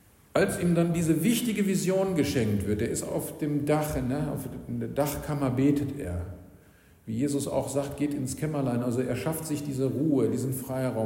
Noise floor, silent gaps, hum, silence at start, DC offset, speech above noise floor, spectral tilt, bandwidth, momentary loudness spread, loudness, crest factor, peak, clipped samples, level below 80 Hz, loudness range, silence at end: -57 dBFS; none; none; 0.35 s; under 0.1%; 29 dB; -6 dB/octave; 16.5 kHz; 8 LU; -28 LUFS; 16 dB; -12 dBFS; under 0.1%; -50 dBFS; 4 LU; 0 s